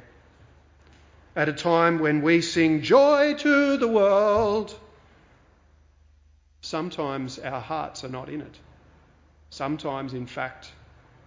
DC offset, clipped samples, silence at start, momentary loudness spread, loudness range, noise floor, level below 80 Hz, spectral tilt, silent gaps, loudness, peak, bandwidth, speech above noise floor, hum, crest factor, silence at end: under 0.1%; under 0.1%; 1.35 s; 16 LU; 14 LU; -58 dBFS; -56 dBFS; -5.5 dB/octave; none; -23 LUFS; -6 dBFS; 7.6 kHz; 35 dB; none; 20 dB; 0.55 s